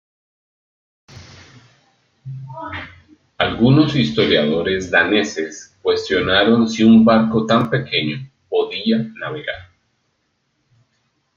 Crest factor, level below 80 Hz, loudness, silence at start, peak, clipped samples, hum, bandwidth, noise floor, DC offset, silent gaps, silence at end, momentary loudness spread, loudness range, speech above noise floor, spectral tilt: 18 dB; -50 dBFS; -16 LUFS; 1.15 s; 0 dBFS; under 0.1%; none; 7.4 kHz; -68 dBFS; under 0.1%; none; 1.75 s; 18 LU; 10 LU; 52 dB; -6 dB/octave